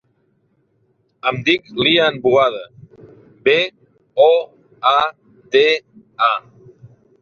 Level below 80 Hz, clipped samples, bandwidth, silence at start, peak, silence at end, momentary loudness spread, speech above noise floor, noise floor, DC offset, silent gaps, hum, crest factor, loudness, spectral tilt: -60 dBFS; under 0.1%; 7 kHz; 1.25 s; 0 dBFS; 0.8 s; 10 LU; 47 dB; -62 dBFS; under 0.1%; none; none; 18 dB; -16 LUFS; -5 dB/octave